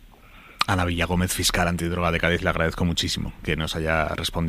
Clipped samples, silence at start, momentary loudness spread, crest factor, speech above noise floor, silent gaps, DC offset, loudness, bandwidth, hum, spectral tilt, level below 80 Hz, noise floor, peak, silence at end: under 0.1%; 0 s; 5 LU; 22 dB; 24 dB; none; under 0.1%; -23 LUFS; 16 kHz; none; -4 dB/octave; -36 dBFS; -48 dBFS; -2 dBFS; 0 s